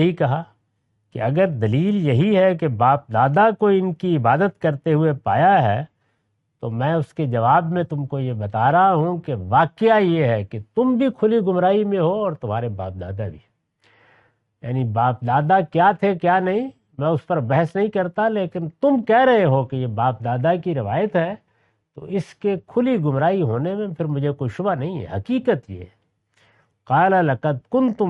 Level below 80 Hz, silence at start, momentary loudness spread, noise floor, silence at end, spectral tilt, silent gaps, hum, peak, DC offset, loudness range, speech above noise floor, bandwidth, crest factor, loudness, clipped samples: -60 dBFS; 0 s; 11 LU; -70 dBFS; 0 s; -9.5 dB/octave; none; none; -4 dBFS; under 0.1%; 5 LU; 51 dB; 6.4 kHz; 16 dB; -20 LUFS; under 0.1%